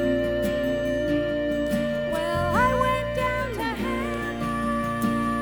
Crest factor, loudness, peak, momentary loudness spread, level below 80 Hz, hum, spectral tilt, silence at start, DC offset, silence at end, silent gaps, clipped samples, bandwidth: 16 dB; -25 LUFS; -10 dBFS; 6 LU; -40 dBFS; none; -6 dB/octave; 0 s; under 0.1%; 0 s; none; under 0.1%; over 20 kHz